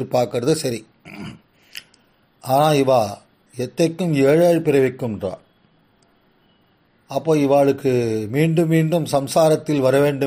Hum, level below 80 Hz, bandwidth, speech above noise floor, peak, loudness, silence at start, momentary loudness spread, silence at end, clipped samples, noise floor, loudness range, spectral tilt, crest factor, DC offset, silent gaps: none; -58 dBFS; 15.5 kHz; 42 dB; -4 dBFS; -18 LUFS; 0 s; 21 LU; 0 s; under 0.1%; -59 dBFS; 4 LU; -6.5 dB/octave; 16 dB; under 0.1%; none